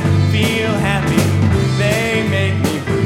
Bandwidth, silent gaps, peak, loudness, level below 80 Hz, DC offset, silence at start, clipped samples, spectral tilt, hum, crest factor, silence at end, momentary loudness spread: 16 kHz; none; -2 dBFS; -15 LUFS; -36 dBFS; under 0.1%; 0 s; under 0.1%; -6 dB/octave; none; 14 dB; 0 s; 2 LU